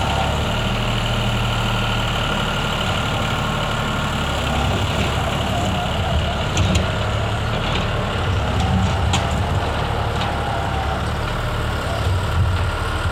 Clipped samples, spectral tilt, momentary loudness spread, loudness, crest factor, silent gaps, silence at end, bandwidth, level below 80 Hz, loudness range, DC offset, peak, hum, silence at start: under 0.1%; -5 dB/octave; 3 LU; -21 LUFS; 16 dB; none; 0 s; 16.5 kHz; -28 dBFS; 1 LU; under 0.1%; -4 dBFS; none; 0 s